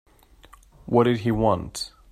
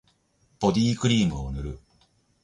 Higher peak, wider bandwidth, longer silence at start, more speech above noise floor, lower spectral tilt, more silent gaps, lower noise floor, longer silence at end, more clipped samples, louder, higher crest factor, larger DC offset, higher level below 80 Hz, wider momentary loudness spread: first, -4 dBFS vs -8 dBFS; first, 14.5 kHz vs 11 kHz; first, 0.85 s vs 0.6 s; second, 30 dB vs 42 dB; about the same, -6.5 dB/octave vs -6 dB/octave; neither; second, -52 dBFS vs -66 dBFS; second, 0.25 s vs 0.65 s; neither; about the same, -23 LUFS vs -25 LUFS; about the same, 20 dB vs 18 dB; neither; about the same, -46 dBFS vs -42 dBFS; second, 12 LU vs 15 LU